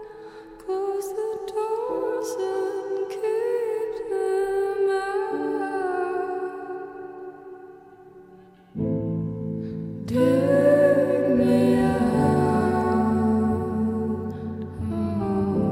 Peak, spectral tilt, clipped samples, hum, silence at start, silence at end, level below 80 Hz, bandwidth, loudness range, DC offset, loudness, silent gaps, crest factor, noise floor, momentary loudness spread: -8 dBFS; -7.5 dB/octave; under 0.1%; none; 0 s; 0 s; -52 dBFS; 16 kHz; 12 LU; under 0.1%; -24 LUFS; none; 16 dB; -50 dBFS; 16 LU